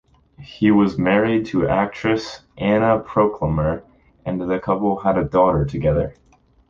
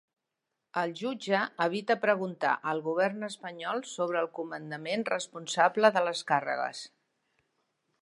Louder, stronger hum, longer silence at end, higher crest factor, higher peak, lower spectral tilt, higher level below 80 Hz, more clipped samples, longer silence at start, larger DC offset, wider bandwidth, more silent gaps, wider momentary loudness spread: first, -19 LUFS vs -30 LUFS; neither; second, 0.55 s vs 1.15 s; second, 16 dB vs 24 dB; first, -4 dBFS vs -8 dBFS; first, -8 dB/octave vs -4 dB/octave; first, -40 dBFS vs -86 dBFS; neither; second, 0.4 s vs 0.75 s; neither; second, 7.4 kHz vs 11.5 kHz; neither; second, 9 LU vs 13 LU